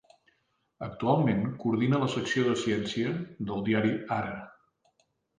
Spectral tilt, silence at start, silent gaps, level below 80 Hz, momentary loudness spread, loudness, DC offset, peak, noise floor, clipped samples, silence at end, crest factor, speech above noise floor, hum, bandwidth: -6.5 dB/octave; 0.8 s; none; -62 dBFS; 10 LU; -29 LUFS; under 0.1%; -12 dBFS; -74 dBFS; under 0.1%; 0.9 s; 18 dB; 46 dB; none; 9.6 kHz